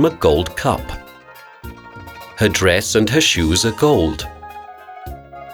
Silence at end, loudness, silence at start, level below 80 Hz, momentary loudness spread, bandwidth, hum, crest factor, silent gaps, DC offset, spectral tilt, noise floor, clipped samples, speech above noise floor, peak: 0 s; -16 LUFS; 0 s; -34 dBFS; 22 LU; 19.5 kHz; none; 18 dB; none; under 0.1%; -4 dB/octave; -41 dBFS; under 0.1%; 26 dB; 0 dBFS